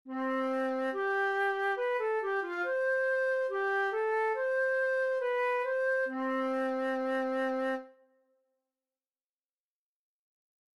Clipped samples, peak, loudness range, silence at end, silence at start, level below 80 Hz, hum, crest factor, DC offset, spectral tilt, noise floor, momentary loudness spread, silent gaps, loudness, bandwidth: under 0.1%; -22 dBFS; 7 LU; 2.85 s; 0.05 s; -86 dBFS; none; 10 dB; under 0.1%; -3.5 dB/octave; under -90 dBFS; 3 LU; none; -31 LUFS; 11.5 kHz